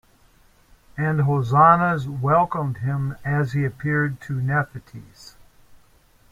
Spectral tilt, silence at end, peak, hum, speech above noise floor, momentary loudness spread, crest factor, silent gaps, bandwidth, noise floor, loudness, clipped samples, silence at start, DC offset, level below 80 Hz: -8.5 dB/octave; 1 s; -2 dBFS; none; 35 dB; 12 LU; 20 dB; none; 7.6 kHz; -56 dBFS; -21 LUFS; under 0.1%; 0.95 s; under 0.1%; -52 dBFS